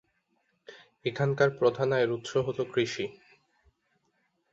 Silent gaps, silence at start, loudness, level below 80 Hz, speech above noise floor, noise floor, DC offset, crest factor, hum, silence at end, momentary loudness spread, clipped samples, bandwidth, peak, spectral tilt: none; 0.7 s; -29 LUFS; -68 dBFS; 47 dB; -75 dBFS; under 0.1%; 20 dB; none; 1.4 s; 11 LU; under 0.1%; 8 kHz; -10 dBFS; -6 dB/octave